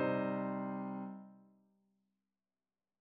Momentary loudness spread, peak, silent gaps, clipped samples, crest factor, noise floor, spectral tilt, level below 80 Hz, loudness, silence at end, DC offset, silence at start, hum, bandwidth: 17 LU; -24 dBFS; none; under 0.1%; 18 dB; under -90 dBFS; -7 dB/octave; -82 dBFS; -40 LUFS; 1.6 s; under 0.1%; 0 s; none; 4.5 kHz